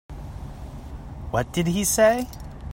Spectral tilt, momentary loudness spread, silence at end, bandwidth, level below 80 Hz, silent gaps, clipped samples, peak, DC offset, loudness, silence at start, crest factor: -4.5 dB/octave; 21 LU; 0 s; 16.5 kHz; -40 dBFS; none; under 0.1%; -6 dBFS; under 0.1%; -22 LUFS; 0.1 s; 20 dB